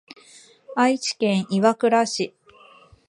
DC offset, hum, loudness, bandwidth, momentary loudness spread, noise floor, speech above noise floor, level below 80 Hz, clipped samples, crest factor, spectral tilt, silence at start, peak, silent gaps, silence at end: under 0.1%; none; -21 LUFS; 11.5 kHz; 9 LU; -51 dBFS; 31 dB; -70 dBFS; under 0.1%; 20 dB; -4.5 dB/octave; 0.7 s; -2 dBFS; none; 0.8 s